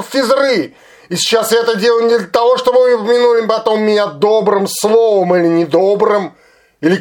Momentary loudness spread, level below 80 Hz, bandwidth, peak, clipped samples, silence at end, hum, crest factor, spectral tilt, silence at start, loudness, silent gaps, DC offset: 6 LU; -60 dBFS; 17.5 kHz; 0 dBFS; under 0.1%; 0 s; none; 12 dB; -4 dB/octave; 0 s; -12 LUFS; none; under 0.1%